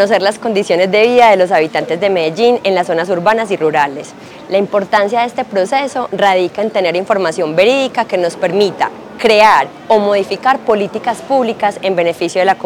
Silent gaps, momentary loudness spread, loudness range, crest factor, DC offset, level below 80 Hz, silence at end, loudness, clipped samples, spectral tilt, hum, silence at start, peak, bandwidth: none; 8 LU; 3 LU; 12 dB; under 0.1%; -56 dBFS; 0 s; -13 LUFS; under 0.1%; -4.5 dB/octave; none; 0 s; 0 dBFS; 18 kHz